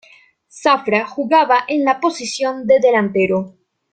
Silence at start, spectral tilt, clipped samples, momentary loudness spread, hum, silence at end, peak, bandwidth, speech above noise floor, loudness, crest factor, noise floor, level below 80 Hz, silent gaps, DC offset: 0.55 s; -4.5 dB/octave; under 0.1%; 8 LU; none; 0.45 s; -2 dBFS; 9.2 kHz; 34 dB; -16 LUFS; 16 dB; -49 dBFS; -62 dBFS; none; under 0.1%